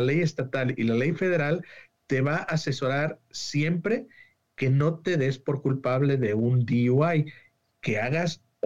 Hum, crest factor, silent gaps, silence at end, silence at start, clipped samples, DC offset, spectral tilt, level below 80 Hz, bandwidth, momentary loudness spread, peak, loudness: none; 14 dB; none; 0.3 s; 0 s; under 0.1%; 0.2%; -7 dB/octave; -64 dBFS; 7.8 kHz; 7 LU; -12 dBFS; -26 LUFS